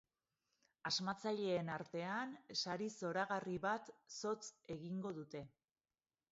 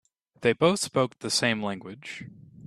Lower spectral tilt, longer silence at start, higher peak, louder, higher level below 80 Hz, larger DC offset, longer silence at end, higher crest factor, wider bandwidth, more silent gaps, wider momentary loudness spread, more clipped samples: about the same, -3 dB/octave vs -4 dB/octave; first, 0.85 s vs 0.4 s; second, -26 dBFS vs -8 dBFS; second, -43 LUFS vs -26 LUFS; second, -80 dBFS vs -66 dBFS; neither; first, 0.85 s vs 0 s; about the same, 18 dB vs 20 dB; second, 7.6 kHz vs 14 kHz; neither; second, 10 LU vs 16 LU; neither